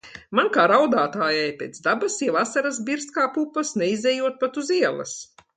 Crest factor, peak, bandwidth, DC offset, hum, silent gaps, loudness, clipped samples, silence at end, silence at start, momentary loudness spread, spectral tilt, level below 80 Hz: 18 dB; -4 dBFS; 9.6 kHz; under 0.1%; none; none; -22 LUFS; under 0.1%; 0.35 s; 0.05 s; 9 LU; -3.5 dB/octave; -70 dBFS